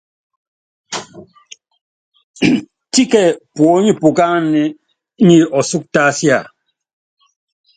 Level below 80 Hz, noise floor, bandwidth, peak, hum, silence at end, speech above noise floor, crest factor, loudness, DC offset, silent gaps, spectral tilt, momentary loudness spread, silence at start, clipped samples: -58 dBFS; -43 dBFS; 9.6 kHz; 0 dBFS; none; 1.35 s; 31 dB; 16 dB; -13 LUFS; under 0.1%; 1.81-2.12 s, 2.23-2.34 s; -5 dB/octave; 10 LU; 0.9 s; under 0.1%